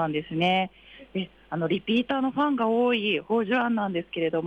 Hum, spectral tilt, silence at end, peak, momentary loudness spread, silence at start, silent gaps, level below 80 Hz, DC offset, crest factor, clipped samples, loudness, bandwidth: none; -7.5 dB/octave; 0 s; -14 dBFS; 10 LU; 0 s; none; -62 dBFS; under 0.1%; 12 dB; under 0.1%; -26 LUFS; 6.6 kHz